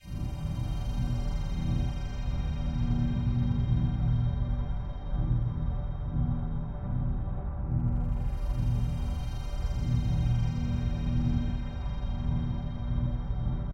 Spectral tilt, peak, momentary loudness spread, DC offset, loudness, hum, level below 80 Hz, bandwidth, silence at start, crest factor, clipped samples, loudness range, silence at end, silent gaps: -8.5 dB/octave; -16 dBFS; 7 LU; under 0.1%; -32 LUFS; none; -32 dBFS; 7.8 kHz; 0 s; 14 dB; under 0.1%; 2 LU; 0 s; none